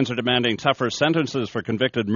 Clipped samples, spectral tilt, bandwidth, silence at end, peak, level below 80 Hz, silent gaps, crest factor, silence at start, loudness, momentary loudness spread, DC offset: under 0.1%; -3.5 dB/octave; 7.2 kHz; 0 s; -2 dBFS; -58 dBFS; none; 20 dB; 0 s; -22 LUFS; 5 LU; under 0.1%